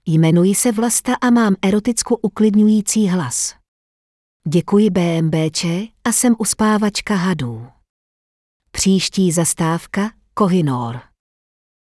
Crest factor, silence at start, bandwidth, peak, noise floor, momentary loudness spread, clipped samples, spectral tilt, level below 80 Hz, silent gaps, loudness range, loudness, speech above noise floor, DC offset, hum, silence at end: 14 dB; 0.05 s; 12 kHz; -4 dBFS; under -90 dBFS; 9 LU; under 0.1%; -5 dB/octave; -50 dBFS; 3.68-4.40 s, 7.89-8.60 s; 4 LU; -16 LUFS; over 74 dB; under 0.1%; none; 0.9 s